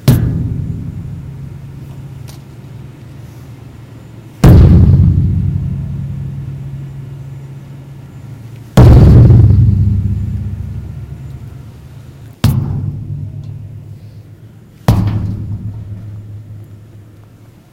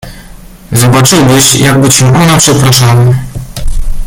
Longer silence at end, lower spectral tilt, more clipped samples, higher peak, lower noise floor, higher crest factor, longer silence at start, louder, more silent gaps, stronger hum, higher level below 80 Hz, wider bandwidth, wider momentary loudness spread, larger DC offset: first, 1 s vs 0 s; first, -8.5 dB/octave vs -4 dB/octave; about the same, 1% vs 0.6%; about the same, 0 dBFS vs 0 dBFS; first, -39 dBFS vs -29 dBFS; first, 12 dB vs 6 dB; about the same, 0.05 s vs 0.05 s; second, -11 LUFS vs -5 LUFS; neither; neither; about the same, -20 dBFS vs -18 dBFS; second, 16 kHz vs over 20 kHz; first, 27 LU vs 15 LU; neither